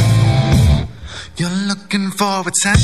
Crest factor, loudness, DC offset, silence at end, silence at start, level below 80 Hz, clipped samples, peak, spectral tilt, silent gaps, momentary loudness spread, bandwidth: 14 dB; -16 LUFS; 0.7%; 0 s; 0 s; -24 dBFS; under 0.1%; 0 dBFS; -4.5 dB/octave; none; 13 LU; 14 kHz